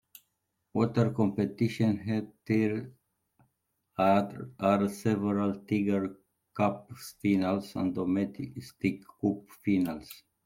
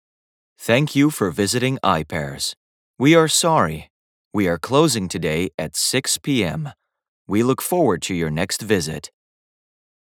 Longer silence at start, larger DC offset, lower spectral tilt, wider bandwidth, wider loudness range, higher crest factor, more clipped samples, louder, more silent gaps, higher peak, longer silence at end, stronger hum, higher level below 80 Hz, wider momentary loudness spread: first, 0.75 s vs 0.6 s; neither; first, -7.5 dB/octave vs -4 dB/octave; second, 16.5 kHz vs 19.5 kHz; about the same, 2 LU vs 4 LU; about the same, 20 dB vs 20 dB; neither; second, -30 LUFS vs -19 LUFS; second, none vs 2.57-2.94 s, 3.90-4.31 s, 5.54-5.58 s, 7.08-7.25 s; second, -12 dBFS vs 0 dBFS; second, 0.3 s vs 1.1 s; neither; second, -66 dBFS vs -50 dBFS; about the same, 12 LU vs 11 LU